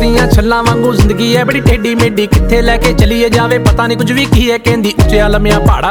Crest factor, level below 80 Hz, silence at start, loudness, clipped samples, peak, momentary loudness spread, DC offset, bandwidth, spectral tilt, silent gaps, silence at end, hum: 8 dB; -16 dBFS; 0 s; -10 LUFS; 0.2%; 0 dBFS; 2 LU; under 0.1%; over 20 kHz; -6 dB/octave; none; 0 s; none